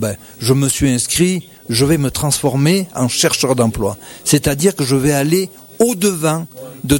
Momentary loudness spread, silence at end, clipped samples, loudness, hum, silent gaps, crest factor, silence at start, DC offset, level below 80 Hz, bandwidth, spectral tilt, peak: 8 LU; 0 s; under 0.1%; -15 LUFS; none; none; 14 dB; 0 s; under 0.1%; -38 dBFS; 19 kHz; -4.5 dB/octave; -2 dBFS